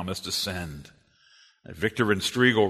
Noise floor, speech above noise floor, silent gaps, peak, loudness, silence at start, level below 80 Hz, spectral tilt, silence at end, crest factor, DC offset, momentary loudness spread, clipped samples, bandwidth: -59 dBFS; 33 dB; none; -6 dBFS; -26 LUFS; 0 s; -54 dBFS; -4 dB/octave; 0 s; 22 dB; under 0.1%; 20 LU; under 0.1%; 13.5 kHz